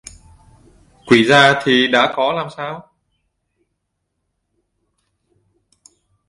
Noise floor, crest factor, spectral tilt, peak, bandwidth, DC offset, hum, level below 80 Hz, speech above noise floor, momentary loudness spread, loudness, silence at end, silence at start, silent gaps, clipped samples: -74 dBFS; 20 dB; -4.5 dB/octave; 0 dBFS; 11.5 kHz; under 0.1%; none; -54 dBFS; 60 dB; 18 LU; -14 LUFS; 3.5 s; 1.05 s; none; under 0.1%